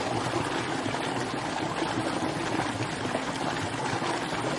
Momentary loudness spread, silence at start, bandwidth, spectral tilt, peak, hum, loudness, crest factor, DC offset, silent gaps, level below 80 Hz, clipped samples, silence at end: 2 LU; 0 s; 11.5 kHz; -4.5 dB/octave; -14 dBFS; none; -30 LUFS; 16 dB; under 0.1%; none; -56 dBFS; under 0.1%; 0 s